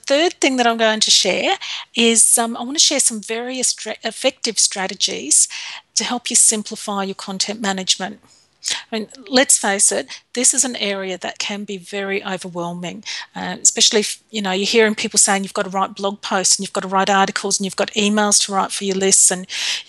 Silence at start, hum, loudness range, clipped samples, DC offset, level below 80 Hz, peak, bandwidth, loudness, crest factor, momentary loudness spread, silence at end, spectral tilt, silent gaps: 0.05 s; none; 5 LU; under 0.1%; under 0.1%; -68 dBFS; 0 dBFS; 14 kHz; -16 LUFS; 18 dB; 14 LU; 0.05 s; -1.5 dB/octave; none